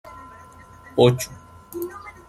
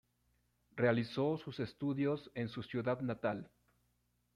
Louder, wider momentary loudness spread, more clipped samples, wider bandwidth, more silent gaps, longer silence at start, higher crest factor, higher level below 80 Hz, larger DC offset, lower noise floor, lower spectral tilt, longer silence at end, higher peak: first, -22 LUFS vs -38 LUFS; first, 24 LU vs 9 LU; neither; first, 15.5 kHz vs 11 kHz; neither; second, 0.05 s vs 0.75 s; about the same, 22 dB vs 20 dB; first, -54 dBFS vs -72 dBFS; neither; second, -46 dBFS vs -79 dBFS; second, -6 dB/octave vs -8 dB/octave; second, 0.2 s vs 0.9 s; first, -2 dBFS vs -18 dBFS